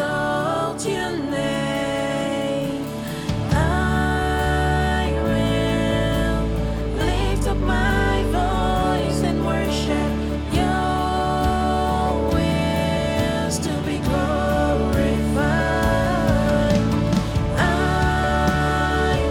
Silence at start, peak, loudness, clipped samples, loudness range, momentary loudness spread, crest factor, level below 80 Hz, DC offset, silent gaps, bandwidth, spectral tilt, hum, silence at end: 0 s; -6 dBFS; -21 LUFS; under 0.1%; 2 LU; 4 LU; 14 dB; -28 dBFS; under 0.1%; none; 18 kHz; -6 dB/octave; none; 0 s